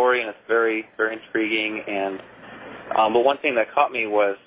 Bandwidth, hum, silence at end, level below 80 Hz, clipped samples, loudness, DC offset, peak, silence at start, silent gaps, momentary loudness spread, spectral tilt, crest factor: 4 kHz; none; 0.1 s; -66 dBFS; under 0.1%; -22 LUFS; under 0.1%; -2 dBFS; 0 s; none; 17 LU; -7.5 dB/octave; 20 dB